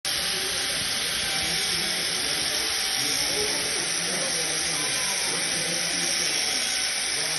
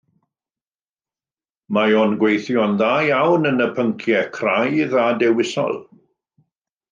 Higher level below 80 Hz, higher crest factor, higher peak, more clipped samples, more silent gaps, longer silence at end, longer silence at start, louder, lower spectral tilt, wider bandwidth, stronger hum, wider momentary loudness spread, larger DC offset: first, -54 dBFS vs -70 dBFS; about the same, 16 dB vs 16 dB; second, -10 dBFS vs -4 dBFS; neither; neither; second, 0 s vs 1.1 s; second, 0.05 s vs 1.7 s; second, -23 LUFS vs -18 LUFS; second, 0 dB/octave vs -6 dB/octave; first, 12 kHz vs 9 kHz; neither; second, 2 LU vs 5 LU; neither